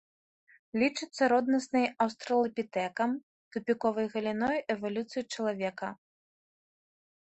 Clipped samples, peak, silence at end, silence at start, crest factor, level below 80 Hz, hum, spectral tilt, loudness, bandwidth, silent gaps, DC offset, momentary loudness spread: under 0.1%; -14 dBFS; 1.35 s; 0.75 s; 18 dB; -72 dBFS; none; -5 dB/octave; -31 LUFS; 8.4 kHz; 3.23-3.51 s; under 0.1%; 10 LU